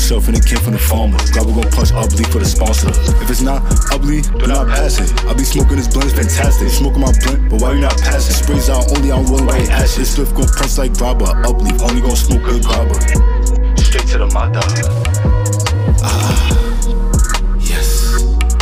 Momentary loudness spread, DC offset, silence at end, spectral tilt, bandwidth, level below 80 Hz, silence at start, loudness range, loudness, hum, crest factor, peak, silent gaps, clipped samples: 3 LU; under 0.1%; 0 s; -5 dB/octave; 16 kHz; -12 dBFS; 0 s; 1 LU; -14 LUFS; none; 10 dB; -2 dBFS; none; under 0.1%